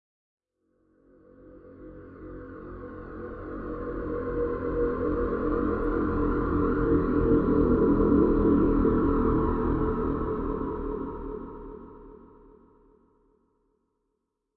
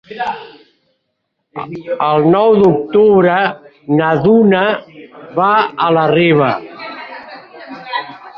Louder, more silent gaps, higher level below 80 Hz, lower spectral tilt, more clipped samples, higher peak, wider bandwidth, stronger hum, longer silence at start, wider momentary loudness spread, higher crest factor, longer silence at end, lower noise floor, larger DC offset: second, -26 LUFS vs -13 LUFS; neither; first, -38 dBFS vs -54 dBFS; first, -12 dB/octave vs -9 dB/octave; neither; second, -10 dBFS vs -2 dBFS; second, 4.4 kHz vs 5.6 kHz; neither; first, 1.45 s vs 0.1 s; about the same, 20 LU vs 20 LU; first, 18 dB vs 12 dB; first, 2.4 s vs 0.1 s; first, -80 dBFS vs -70 dBFS; neither